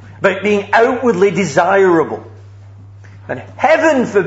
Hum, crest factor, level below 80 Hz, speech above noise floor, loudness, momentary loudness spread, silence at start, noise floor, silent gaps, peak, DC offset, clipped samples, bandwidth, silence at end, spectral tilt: none; 14 dB; -56 dBFS; 24 dB; -13 LUFS; 16 LU; 0 s; -36 dBFS; none; 0 dBFS; under 0.1%; under 0.1%; 8 kHz; 0 s; -5.5 dB/octave